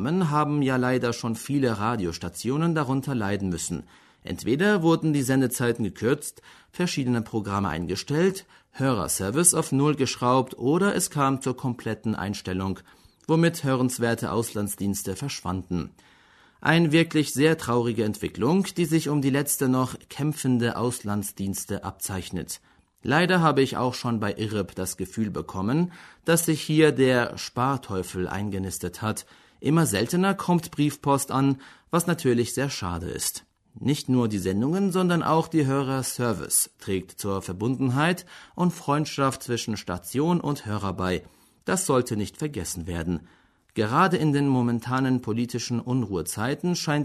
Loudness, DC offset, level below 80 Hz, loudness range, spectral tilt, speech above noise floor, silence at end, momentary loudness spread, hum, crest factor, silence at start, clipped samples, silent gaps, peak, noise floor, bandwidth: -25 LUFS; under 0.1%; -54 dBFS; 4 LU; -5 dB/octave; 32 dB; 0 s; 9 LU; none; 22 dB; 0 s; under 0.1%; none; -4 dBFS; -57 dBFS; 13.5 kHz